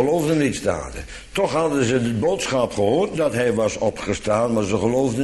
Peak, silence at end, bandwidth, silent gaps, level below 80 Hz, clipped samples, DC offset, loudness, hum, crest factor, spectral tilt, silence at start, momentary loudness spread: -6 dBFS; 0 s; 12.5 kHz; none; -44 dBFS; under 0.1%; under 0.1%; -21 LUFS; none; 14 dB; -5.5 dB/octave; 0 s; 6 LU